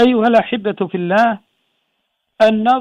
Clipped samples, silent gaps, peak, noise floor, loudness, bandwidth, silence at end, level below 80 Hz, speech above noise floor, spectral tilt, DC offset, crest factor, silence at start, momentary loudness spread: under 0.1%; none; -2 dBFS; -70 dBFS; -15 LUFS; 9.2 kHz; 0 s; -56 dBFS; 56 dB; -6.5 dB/octave; under 0.1%; 14 dB; 0 s; 8 LU